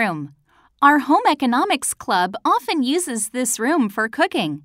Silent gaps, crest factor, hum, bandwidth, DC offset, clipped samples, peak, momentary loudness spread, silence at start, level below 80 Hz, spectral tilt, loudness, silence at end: none; 18 dB; none; 16 kHz; under 0.1%; under 0.1%; 0 dBFS; 6 LU; 0 s; -64 dBFS; -3 dB/octave; -19 LUFS; 0.05 s